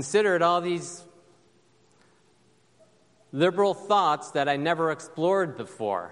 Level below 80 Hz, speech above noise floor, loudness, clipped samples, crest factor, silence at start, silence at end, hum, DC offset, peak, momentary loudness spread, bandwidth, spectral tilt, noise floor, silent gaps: -76 dBFS; 38 dB; -25 LUFS; under 0.1%; 18 dB; 0 s; 0 s; none; under 0.1%; -8 dBFS; 10 LU; 11.5 kHz; -4.5 dB/octave; -63 dBFS; none